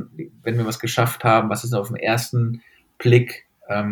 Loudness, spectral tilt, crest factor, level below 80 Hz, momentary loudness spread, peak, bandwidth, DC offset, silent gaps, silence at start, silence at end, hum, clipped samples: -21 LUFS; -6 dB/octave; 20 dB; -62 dBFS; 13 LU; -2 dBFS; 18.5 kHz; under 0.1%; none; 0 s; 0 s; none; under 0.1%